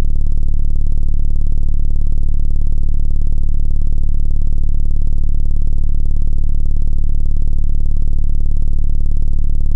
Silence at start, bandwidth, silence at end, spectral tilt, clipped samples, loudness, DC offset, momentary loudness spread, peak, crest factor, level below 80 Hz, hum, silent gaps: 0 s; 0.7 kHz; 0 s; -10 dB/octave; under 0.1%; -21 LUFS; under 0.1%; 0 LU; -4 dBFS; 6 dB; -12 dBFS; none; none